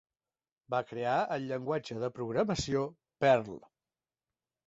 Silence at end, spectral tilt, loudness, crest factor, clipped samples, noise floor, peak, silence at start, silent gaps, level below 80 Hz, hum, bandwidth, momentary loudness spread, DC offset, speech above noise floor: 1.1 s; -5.5 dB/octave; -32 LUFS; 22 dB; under 0.1%; under -90 dBFS; -12 dBFS; 0.7 s; none; -60 dBFS; none; 8 kHz; 10 LU; under 0.1%; over 58 dB